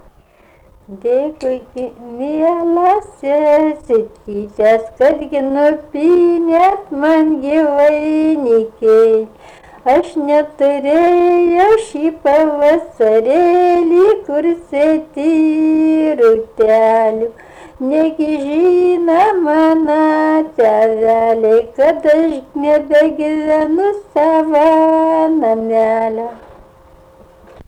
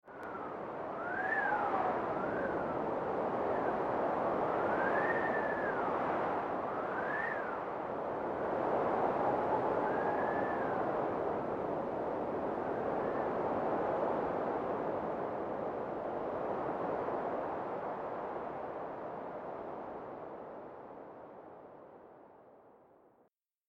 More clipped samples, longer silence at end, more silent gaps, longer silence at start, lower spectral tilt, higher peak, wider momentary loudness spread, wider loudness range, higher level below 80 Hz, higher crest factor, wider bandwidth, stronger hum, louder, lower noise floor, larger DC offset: neither; second, 0.05 s vs 0.95 s; neither; first, 0.9 s vs 0.05 s; second, -6 dB/octave vs -8 dB/octave; first, -4 dBFS vs -20 dBFS; second, 7 LU vs 12 LU; second, 3 LU vs 11 LU; first, -48 dBFS vs -66 dBFS; second, 8 dB vs 16 dB; first, 10 kHz vs 8.8 kHz; neither; first, -13 LUFS vs -36 LUFS; second, -48 dBFS vs -73 dBFS; neither